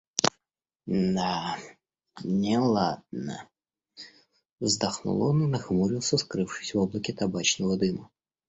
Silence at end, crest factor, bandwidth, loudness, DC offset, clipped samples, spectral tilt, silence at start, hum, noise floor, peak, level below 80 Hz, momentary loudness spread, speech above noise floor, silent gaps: 0.45 s; 28 dB; 8.4 kHz; -27 LUFS; under 0.1%; under 0.1%; -4.5 dB/octave; 0.15 s; none; -85 dBFS; 0 dBFS; -58 dBFS; 14 LU; 57 dB; 0.76-0.80 s, 4.52-4.58 s